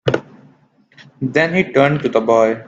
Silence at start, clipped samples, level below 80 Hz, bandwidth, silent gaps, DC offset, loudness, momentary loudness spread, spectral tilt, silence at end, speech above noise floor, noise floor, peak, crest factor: 0.05 s; under 0.1%; -54 dBFS; 7.8 kHz; none; under 0.1%; -16 LUFS; 9 LU; -6.5 dB/octave; 0.05 s; 38 dB; -53 dBFS; 0 dBFS; 16 dB